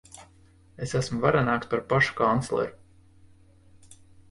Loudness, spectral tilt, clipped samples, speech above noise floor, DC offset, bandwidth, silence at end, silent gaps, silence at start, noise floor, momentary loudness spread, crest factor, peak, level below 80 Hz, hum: -26 LUFS; -6 dB/octave; under 0.1%; 31 dB; under 0.1%; 11.5 kHz; 0.35 s; none; 0.15 s; -56 dBFS; 8 LU; 20 dB; -8 dBFS; -54 dBFS; none